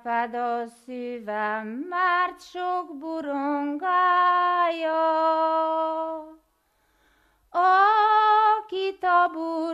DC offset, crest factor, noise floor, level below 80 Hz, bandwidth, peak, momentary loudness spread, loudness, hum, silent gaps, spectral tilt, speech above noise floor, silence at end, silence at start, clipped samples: under 0.1%; 16 dB; -68 dBFS; -72 dBFS; 11.5 kHz; -8 dBFS; 14 LU; -23 LUFS; none; none; -4.5 dB/octave; 44 dB; 0 s; 0.05 s; under 0.1%